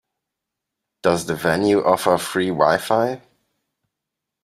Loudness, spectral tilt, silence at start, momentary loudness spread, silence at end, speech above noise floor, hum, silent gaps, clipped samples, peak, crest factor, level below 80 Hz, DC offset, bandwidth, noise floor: -19 LUFS; -5 dB/octave; 1.05 s; 6 LU; 1.25 s; 64 dB; none; none; under 0.1%; -2 dBFS; 20 dB; -58 dBFS; under 0.1%; 16 kHz; -83 dBFS